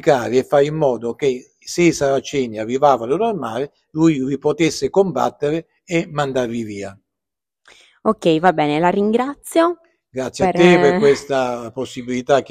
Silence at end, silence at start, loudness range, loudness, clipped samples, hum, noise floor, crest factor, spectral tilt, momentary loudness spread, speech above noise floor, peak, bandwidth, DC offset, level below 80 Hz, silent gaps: 0.05 s; 0.05 s; 5 LU; -18 LUFS; under 0.1%; none; -86 dBFS; 18 dB; -5.5 dB/octave; 12 LU; 69 dB; 0 dBFS; 15 kHz; under 0.1%; -54 dBFS; none